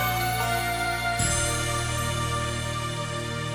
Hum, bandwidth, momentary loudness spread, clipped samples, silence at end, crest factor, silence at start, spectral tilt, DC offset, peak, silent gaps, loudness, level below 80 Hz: none; 19 kHz; 6 LU; under 0.1%; 0 s; 14 dB; 0 s; -3.5 dB/octave; under 0.1%; -12 dBFS; none; -26 LUFS; -40 dBFS